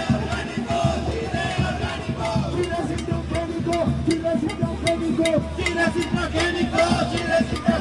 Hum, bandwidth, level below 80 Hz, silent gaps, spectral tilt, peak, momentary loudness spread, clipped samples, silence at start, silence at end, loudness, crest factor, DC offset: none; 11.5 kHz; -38 dBFS; none; -5.5 dB/octave; -4 dBFS; 5 LU; under 0.1%; 0 s; 0 s; -23 LUFS; 18 dB; under 0.1%